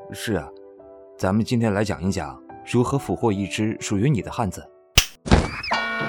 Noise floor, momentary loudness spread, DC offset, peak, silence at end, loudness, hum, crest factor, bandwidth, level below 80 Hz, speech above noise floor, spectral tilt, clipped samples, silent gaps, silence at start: -45 dBFS; 9 LU; under 0.1%; 0 dBFS; 0 s; -23 LUFS; none; 24 dB; 19 kHz; -34 dBFS; 22 dB; -5 dB/octave; under 0.1%; none; 0 s